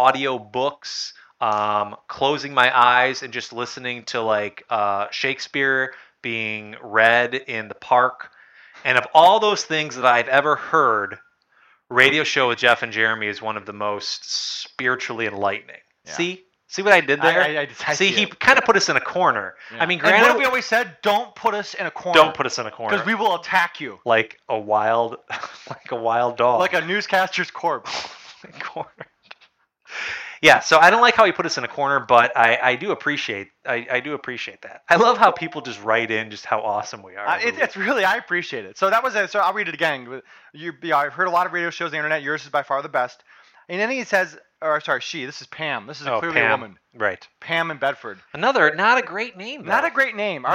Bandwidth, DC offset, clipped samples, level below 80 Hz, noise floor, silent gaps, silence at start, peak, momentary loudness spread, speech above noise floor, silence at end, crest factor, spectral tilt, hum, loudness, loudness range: 16.5 kHz; under 0.1%; under 0.1%; -66 dBFS; -59 dBFS; none; 0 s; 0 dBFS; 14 LU; 39 dB; 0 s; 20 dB; -3 dB/octave; none; -20 LUFS; 6 LU